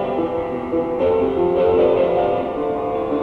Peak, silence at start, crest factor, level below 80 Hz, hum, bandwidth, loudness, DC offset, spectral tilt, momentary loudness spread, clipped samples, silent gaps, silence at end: -6 dBFS; 0 s; 14 dB; -44 dBFS; none; 4.9 kHz; -19 LUFS; under 0.1%; -8.5 dB/octave; 7 LU; under 0.1%; none; 0 s